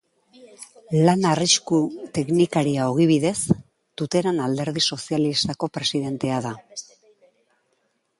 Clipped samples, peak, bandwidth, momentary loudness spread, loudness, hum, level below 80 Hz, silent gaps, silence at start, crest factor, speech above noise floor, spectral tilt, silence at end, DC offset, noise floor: under 0.1%; -4 dBFS; 11.5 kHz; 16 LU; -22 LUFS; none; -58 dBFS; none; 0.4 s; 20 dB; 48 dB; -4.5 dB/octave; 1.4 s; under 0.1%; -70 dBFS